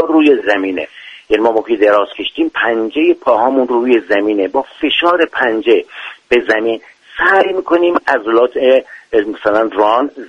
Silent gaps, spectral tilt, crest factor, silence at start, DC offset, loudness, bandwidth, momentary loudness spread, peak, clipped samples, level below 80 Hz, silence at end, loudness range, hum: none; -5 dB/octave; 12 dB; 0 s; under 0.1%; -13 LUFS; 7.6 kHz; 7 LU; 0 dBFS; under 0.1%; -52 dBFS; 0 s; 1 LU; none